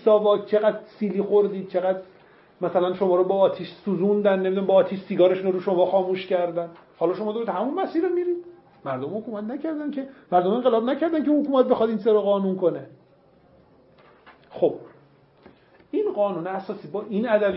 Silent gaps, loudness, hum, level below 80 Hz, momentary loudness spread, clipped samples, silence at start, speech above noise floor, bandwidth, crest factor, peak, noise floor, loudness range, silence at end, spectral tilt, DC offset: none; -23 LUFS; none; -72 dBFS; 11 LU; under 0.1%; 0 s; 34 dB; 5.8 kHz; 18 dB; -6 dBFS; -56 dBFS; 8 LU; 0 s; -11 dB/octave; under 0.1%